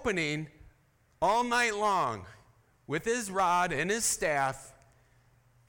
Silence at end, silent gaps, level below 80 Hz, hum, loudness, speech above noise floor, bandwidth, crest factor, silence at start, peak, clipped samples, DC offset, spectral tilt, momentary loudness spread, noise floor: 1 s; none; -60 dBFS; none; -29 LUFS; 37 dB; 18 kHz; 18 dB; 0 s; -14 dBFS; under 0.1%; under 0.1%; -3 dB/octave; 10 LU; -67 dBFS